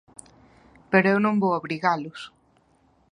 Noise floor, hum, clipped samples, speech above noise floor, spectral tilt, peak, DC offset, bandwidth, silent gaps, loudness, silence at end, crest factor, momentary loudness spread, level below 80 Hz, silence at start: -62 dBFS; none; under 0.1%; 40 dB; -7 dB/octave; -2 dBFS; under 0.1%; 11 kHz; none; -23 LUFS; 0.85 s; 24 dB; 19 LU; -66 dBFS; 0.9 s